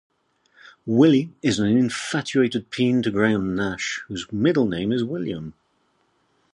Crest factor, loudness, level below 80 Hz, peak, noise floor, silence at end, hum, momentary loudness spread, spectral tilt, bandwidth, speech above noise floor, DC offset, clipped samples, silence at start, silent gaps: 18 dB; -22 LUFS; -54 dBFS; -4 dBFS; -67 dBFS; 1.05 s; none; 12 LU; -5.5 dB/octave; 11.5 kHz; 45 dB; under 0.1%; under 0.1%; 0.85 s; none